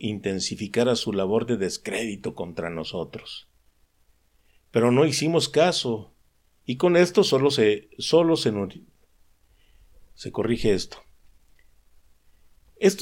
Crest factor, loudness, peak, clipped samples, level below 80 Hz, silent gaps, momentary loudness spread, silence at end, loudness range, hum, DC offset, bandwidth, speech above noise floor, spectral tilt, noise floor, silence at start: 18 dB; -24 LUFS; -6 dBFS; under 0.1%; -54 dBFS; none; 14 LU; 0 s; 10 LU; none; under 0.1%; 16.5 kHz; 40 dB; -5 dB/octave; -63 dBFS; 0 s